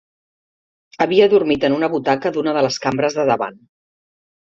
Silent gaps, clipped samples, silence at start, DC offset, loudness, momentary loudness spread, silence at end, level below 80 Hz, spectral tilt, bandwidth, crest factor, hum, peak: none; under 0.1%; 1 s; under 0.1%; -17 LUFS; 7 LU; 0.9 s; -58 dBFS; -5 dB/octave; 7.6 kHz; 16 dB; none; -2 dBFS